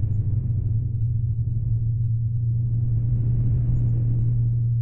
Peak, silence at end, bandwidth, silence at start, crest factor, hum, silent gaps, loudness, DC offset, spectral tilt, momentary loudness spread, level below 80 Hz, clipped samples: -12 dBFS; 0 s; 0.9 kHz; 0 s; 10 dB; none; none; -24 LUFS; under 0.1%; -14 dB/octave; 2 LU; -32 dBFS; under 0.1%